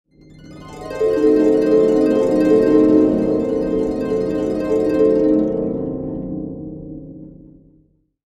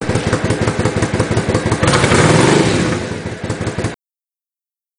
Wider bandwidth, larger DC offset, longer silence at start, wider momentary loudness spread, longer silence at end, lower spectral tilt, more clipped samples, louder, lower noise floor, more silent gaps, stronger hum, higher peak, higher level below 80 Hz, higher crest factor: second, 9 kHz vs 10.5 kHz; neither; first, 0.35 s vs 0 s; first, 18 LU vs 13 LU; about the same, 0.95 s vs 1.05 s; first, -8 dB/octave vs -5 dB/octave; neither; about the same, -16 LUFS vs -15 LUFS; second, -57 dBFS vs under -90 dBFS; neither; neither; about the same, -2 dBFS vs 0 dBFS; second, -42 dBFS vs -34 dBFS; about the same, 16 dB vs 16 dB